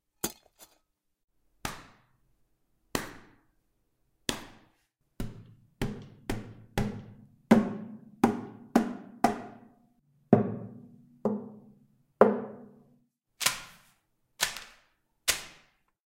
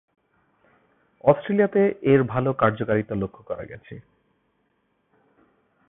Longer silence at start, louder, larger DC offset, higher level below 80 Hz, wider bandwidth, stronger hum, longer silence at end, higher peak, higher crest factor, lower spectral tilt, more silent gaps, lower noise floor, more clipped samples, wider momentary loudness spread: second, 0.25 s vs 1.25 s; second, -31 LUFS vs -22 LUFS; neither; about the same, -52 dBFS vs -56 dBFS; first, 16 kHz vs 3.9 kHz; neither; second, 0.6 s vs 1.9 s; about the same, -4 dBFS vs -4 dBFS; first, 30 dB vs 22 dB; second, -4.5 dB/octave vs -12 dB/octave; neither; first, -76 dBFS vs -70 dBFS; neither; first, 24 LU vs 19 LU